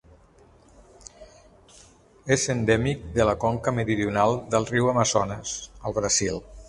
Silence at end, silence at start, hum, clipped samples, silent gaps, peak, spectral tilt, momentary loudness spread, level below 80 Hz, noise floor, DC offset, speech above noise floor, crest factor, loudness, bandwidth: 0 s; 1.2 s; none; under 0.1%; none; -6 dBFS; -4.5 dB/octave; 8 LU; -46 dBFS; -55 dBFS; under 0.1%; 31 dB; 20 dB; -24 LUFS; 11.5 kHz